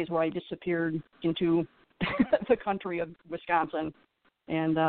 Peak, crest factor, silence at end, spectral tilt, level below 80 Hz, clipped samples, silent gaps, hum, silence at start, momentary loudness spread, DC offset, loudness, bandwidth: -12 dBFS; 18 dB; 0 s; -5 dB/octave; -60 dBFS; under 0.1%; none; none; 0 s; 9 LU; under 0.1%; -30 LUFS; 4.5 kHz